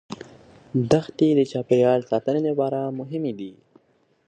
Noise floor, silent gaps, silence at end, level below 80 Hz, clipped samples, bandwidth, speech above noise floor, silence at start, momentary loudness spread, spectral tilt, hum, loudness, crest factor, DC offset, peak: -64 dBFS; none; 0.75 s; -60 dBFS; under 0.1%; 9.4 kHz; 42 dB; 0.1 s; 16 LU; -7.5 dB/octave; none; -22 LUFS; 20 dB; under 0.1%; -4 dBFS